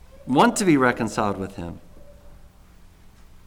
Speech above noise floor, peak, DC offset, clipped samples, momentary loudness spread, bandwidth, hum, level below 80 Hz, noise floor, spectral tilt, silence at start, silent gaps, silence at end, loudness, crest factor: 28 dB; -6 dBFS; under 0.1%; under 0.1%; 17 LU; 17 kHz; none; -48 dBFS; -49 dBFS; -5 dB/octave; 0.15 s; none; 1 s; -21 LUFS; 18 dB